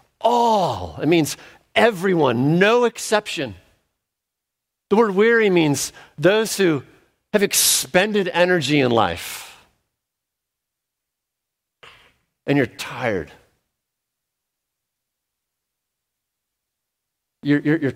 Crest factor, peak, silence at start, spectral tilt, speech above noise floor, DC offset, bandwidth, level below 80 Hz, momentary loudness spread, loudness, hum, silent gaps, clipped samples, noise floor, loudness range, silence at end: 20 dB; -2 dBFS; 0.2 s; -4 dB/octave; 64 dB; under 0.1%; 16 kHz; -58 dBFS; 12 LU; -19 LUFS; none; none; under 0.1%; -83 dBFS; 11 LU; 0 s